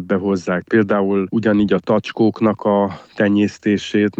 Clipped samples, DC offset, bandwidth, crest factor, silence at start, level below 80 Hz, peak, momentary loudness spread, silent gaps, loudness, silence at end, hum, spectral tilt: under 0.1%; under 0.1%; 7.8 kHz; 14 dB; 0 s; -54 dBFS; -2 dBFS; 4 LU; none; -17 LUFS; 0.1 s; none; -7 dB/octave